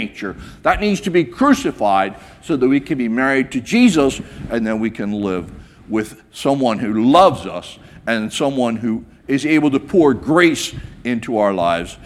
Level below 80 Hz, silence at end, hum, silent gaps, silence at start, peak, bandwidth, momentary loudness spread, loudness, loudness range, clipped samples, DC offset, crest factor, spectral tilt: -42 dBFS; 0 s; none; none; 0 s; 0 dBFS; 14 kHz; 13 LU; -17 LUFS; 2 LU; under 0.1%; under 0.1%; 18 dB; -5.5 dB/octave